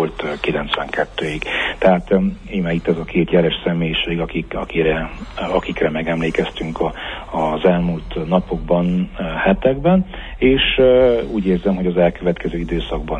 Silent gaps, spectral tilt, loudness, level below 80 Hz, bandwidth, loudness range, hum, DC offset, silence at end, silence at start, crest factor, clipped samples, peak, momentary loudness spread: none; -7.5 dB/octave; -18 LUFS; -34 dBFS; 9.6 kHz; 4 LU; none; under 0.1%; 0 s; 0 s; 16 dB; under 0.1%; -2 dBFS; 9 LU